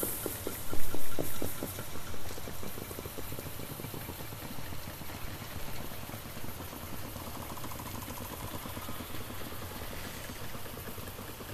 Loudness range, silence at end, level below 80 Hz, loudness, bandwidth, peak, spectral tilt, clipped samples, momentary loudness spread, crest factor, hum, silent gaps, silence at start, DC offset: 2 LU; 0 s; -48 dBFS; -41 LUFS; 14 kHz; -12 dBFS; -4 dB/octave; under 0.1%; 5 LU; 18 dB; none; none; 0 s; under 0.1%